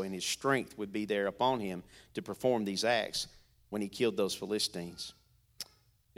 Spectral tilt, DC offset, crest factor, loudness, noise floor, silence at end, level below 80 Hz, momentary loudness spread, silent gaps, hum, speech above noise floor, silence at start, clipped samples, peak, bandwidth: -3.5 dB/octave; under 0.1%; 20 dB; -34 LUFS; -67 dBFS; 0.55 s; -68 dBFS; 14 LU; none; none; 33 dB; 0 s; under 0.1%; -16 dBFS; 16.5 kHz